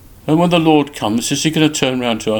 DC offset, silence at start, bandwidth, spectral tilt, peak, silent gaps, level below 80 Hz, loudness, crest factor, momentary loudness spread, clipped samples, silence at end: under 0.1%; 0.25 s; 19 kHz; -4.5 dB/octave; 0 dBFS; none; -46 dBFS; -15 LUFS; 16 dB; 6 LU; under 0.1%; 0 s